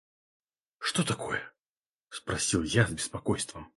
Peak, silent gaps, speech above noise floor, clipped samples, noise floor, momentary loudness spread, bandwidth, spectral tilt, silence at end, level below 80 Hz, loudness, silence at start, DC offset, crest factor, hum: -10 dBFS; 1.68-1.99 s; over 60 dB; under 0.1%; under -90 dBFS; 12 LU; 11.5 kHz; -4 dB/octave; 0.1 s; -54 dBFS; -30 LUFS; 0.8 s; under 0.1%; 22 dB; none